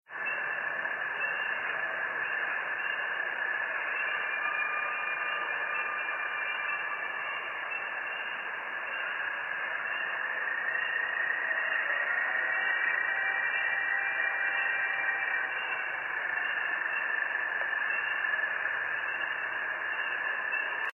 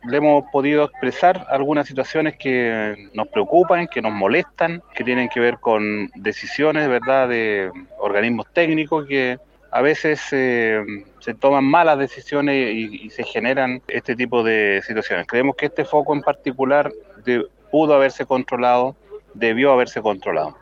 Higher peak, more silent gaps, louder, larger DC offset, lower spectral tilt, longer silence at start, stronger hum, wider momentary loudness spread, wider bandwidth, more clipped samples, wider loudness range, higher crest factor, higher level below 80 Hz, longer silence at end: second, -18 dBFS vs -2 dBFS; neither; second, -30 LUFS vs -19 LUFS; neither; second, -3 dB/octave vs -6 dB/octave; about the same, 0.1 s vs 0.05 s; neither; second, 5 LU vs 9 LU; second, 6.4 kHz vs 7.4 kHz; neither; first, 5 LU vs 2 LU; about the same, 14 dB vs 16 dB; second, -84 dBFS vs -58 dBFS; about the same, 0 s vs 0.1 s